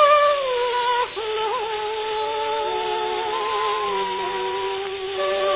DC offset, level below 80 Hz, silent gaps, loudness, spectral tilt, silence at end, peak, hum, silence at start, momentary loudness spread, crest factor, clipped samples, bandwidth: under 0.1%; -58 dBFS; none; -23 LUFS; -6.5 dB/octave; 0 s; -4 dBFS; none; 0 s; 5 LU; 18 dB; under 0.1%; 4 kHz